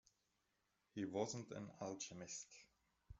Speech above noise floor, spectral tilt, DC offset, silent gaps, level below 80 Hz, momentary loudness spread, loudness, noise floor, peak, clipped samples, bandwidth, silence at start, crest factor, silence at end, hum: 37 dB; -4.5 dB/octave; under 0.1%; none; -74 dBFS; 12 LU; -49 LUFS; -86 dBFS; -28 dBFS; under 0.1%; 8.2 kHz; 0.95 s; 24 dB; 0.05 s; none